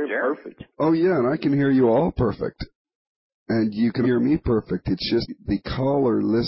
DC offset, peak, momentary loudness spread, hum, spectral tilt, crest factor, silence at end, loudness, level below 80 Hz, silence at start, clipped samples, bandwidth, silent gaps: under 0.1%; -10 dBFS; 10 LU; none; -11 dB/octave; 12 dB; 0 s; -22 LUFS; -44 dBFS; 0 s; under 0.1%; 5.8 kHz; 2.75-2.85 s, 2.95-3.46 s